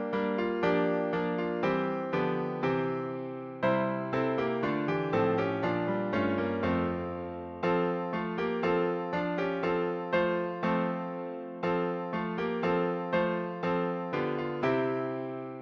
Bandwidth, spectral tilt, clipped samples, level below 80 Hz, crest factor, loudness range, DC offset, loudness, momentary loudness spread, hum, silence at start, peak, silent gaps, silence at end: 6.6 kHz; -8.5 dB/octave; under 0.1%; -62 dBFS; 14 dB; 1 LU; under 0.1%; -31 LUFS; 6 LU; none; 0 s; -16 dBFS; none; 0 s